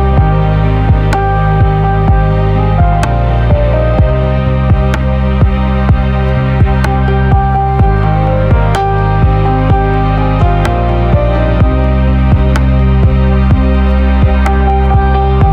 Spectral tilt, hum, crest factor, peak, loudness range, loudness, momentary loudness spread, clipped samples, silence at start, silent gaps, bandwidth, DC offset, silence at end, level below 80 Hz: -8.5 dB/octave; none; 8 dB; 0 dBFS; 1 LU; -11 LUFS; 2 LU; under 0.1%; 0 s; none; 6.6 kHz; under 0.1%; 0 s; -12 dBFS